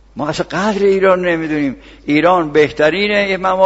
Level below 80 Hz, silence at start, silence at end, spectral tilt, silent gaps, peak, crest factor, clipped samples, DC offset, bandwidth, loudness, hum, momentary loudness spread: -44 dBFS; 0.15 s; 0 s; -5.5 dB/octave; none; 0 dBFS; 14 dB; under 0.1%; under 0.1%; 8 kHz; -14 LUFS; none; 8 LU